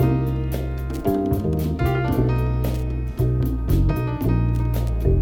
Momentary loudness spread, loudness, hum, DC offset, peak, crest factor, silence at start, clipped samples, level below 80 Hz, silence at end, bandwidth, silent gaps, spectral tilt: 5 LU; -23 LUFS; none; under 0.1%; -6 dBFS; 14 dB; 0 s; under 0.1%; -26 dBFS; 0 s; 17 kHz; none; -8.5 dB/octave